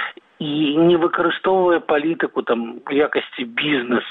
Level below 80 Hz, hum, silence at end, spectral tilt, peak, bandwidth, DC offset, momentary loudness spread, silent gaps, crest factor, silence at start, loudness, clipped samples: -60 dBFS; none; 0 s; -8.5 dB/octave; -6 dBFS; 4.1 kHz; under 0.1%; 9 LU; none; 14 dB; 0 s; -19 LUFS; under 0.1%